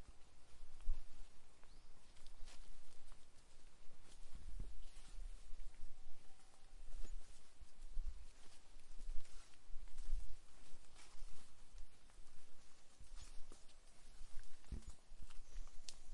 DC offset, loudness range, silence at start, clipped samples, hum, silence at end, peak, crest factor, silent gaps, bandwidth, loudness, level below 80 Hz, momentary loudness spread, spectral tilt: under 0.1%; 6 LU; 0 s; under 0.1%; none; 0 s; -24 dBFS; 16 dB; none; 11 kHz; -61 LUFS; -52 dBFS; 13 LU; -4 dB/octave